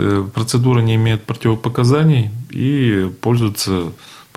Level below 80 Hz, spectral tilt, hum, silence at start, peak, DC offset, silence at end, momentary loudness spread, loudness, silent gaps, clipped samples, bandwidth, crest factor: -48 dBFS; -6.5 dB/octave; none; 0 s; -2 dBFS; under 0.1%; 0.15 s; 6 LU; -16 LUFS; none; under 0.1%; 15.5 kHz; 12 dB